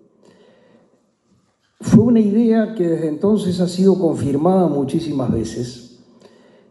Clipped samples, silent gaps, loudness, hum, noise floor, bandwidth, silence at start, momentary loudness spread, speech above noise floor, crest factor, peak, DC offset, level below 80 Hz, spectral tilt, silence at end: under 0.1%; none; -17 LUFS; none; -61 dBFS; 11.5 kHz; 1.8 s; 8 LU; 45 dB; 18 dB; 0 dBFS; under 0.1%; -48 dBFS; -8 dB/octave; 0.85 s